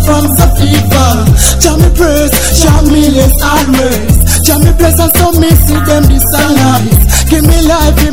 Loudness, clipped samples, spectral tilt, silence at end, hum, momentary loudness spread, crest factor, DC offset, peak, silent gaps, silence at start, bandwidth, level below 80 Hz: -7 LUFS; 7%; -5 dB/octave; 0 s; none; 2 LU; 6 dB; 8%; 0 dBFS; none; 0 s; over 20 kHz; -10 dBFS